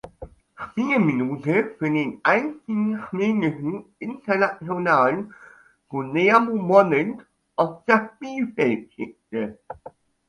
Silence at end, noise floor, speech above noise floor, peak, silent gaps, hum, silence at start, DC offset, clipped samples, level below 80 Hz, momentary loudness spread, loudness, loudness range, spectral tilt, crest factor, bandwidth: 0.4 s; -44 dBFS; 21 dB; -2 dBFS; none; none; 0.05 s; under 0.1%; under 0.1%; -60 dBFS; 17 LU; -22 LUFS; 3 LU; -7.5 dB/octave; 22 dB; 10.5 kHz